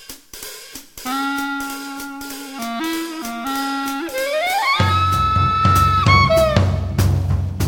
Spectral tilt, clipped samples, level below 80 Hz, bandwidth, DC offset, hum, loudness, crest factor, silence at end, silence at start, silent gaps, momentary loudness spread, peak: -5 dB/octave; under 0.1%; -32 dBFS; 17.5 kHz; under 0.1%; none; -18 LUFS; 18 dB; 0 s; 0 s; none; 17 LU; 0 dBFS